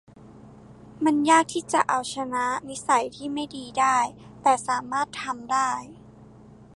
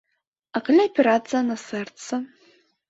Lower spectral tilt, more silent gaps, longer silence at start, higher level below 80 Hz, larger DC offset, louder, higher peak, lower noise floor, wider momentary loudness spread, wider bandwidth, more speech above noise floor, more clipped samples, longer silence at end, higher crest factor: second, -3 dB/octave vs -4.5 dB/octave; neither; second, 0.2 s vs 0.55 s; first, -62 dBFS vs -72 dBFS; neither; about the same, -25 LUFS vs -23 LUFS; about the same, -6 dBFS vs -6 dBFS; second, -49 dBFS vs -60 dBFS; about the same, 11 LU vs 13 LU; first, 11.5 kHz vs 8 kHz; second, 25 dB vs 38 dB; neither; second, 0.35 s vs 0.65 s; about the same, 20 dB vs 18 dB